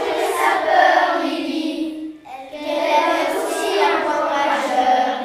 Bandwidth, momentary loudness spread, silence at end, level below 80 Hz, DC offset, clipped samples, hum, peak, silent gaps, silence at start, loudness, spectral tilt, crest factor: 15.5 kHz; 13 LU; 0 s; -62 dBFS; under 0.1%; under 0.1%; none; -2 dBFS; none; 0 s; -18 LUFS; -2 dB/octave; 16 dB